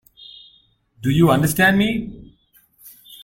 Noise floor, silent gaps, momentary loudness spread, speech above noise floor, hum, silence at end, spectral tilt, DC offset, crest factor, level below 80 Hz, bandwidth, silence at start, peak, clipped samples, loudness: -57 dBFS; none; 25 LU; 41 dB; none; 0.1 s; -5.5 dB/octave; under 0.1%; 18 dB; -46 dBFS; 16.5 kHz; 1 s; -2 dBFS; under 0.1%; -17 LUFS